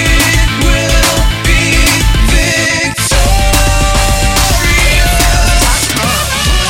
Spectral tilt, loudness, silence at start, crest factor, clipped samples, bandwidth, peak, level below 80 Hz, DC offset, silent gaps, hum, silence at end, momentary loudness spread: -3 dB/octave; -9 LUFS; 0 s; 8 dB; under 0.1%; 17 kHz; 0 dBFS; -12 dBFS; 0.6%; none; none; 0 s; 3 LU